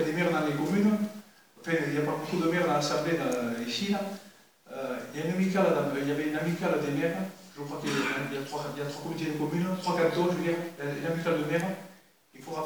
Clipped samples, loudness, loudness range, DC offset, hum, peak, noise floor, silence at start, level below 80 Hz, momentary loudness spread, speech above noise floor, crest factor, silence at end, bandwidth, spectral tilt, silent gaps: under 0.1%; -30 LUFS; 3 LU; under 0.1%; none; -12 dBFS; -56 dBFS; 0 s; -78 dBFS; 11 LU; 27 dB; 18 dB; 0 s; over 20 kHz; -5.5 dB/octave; none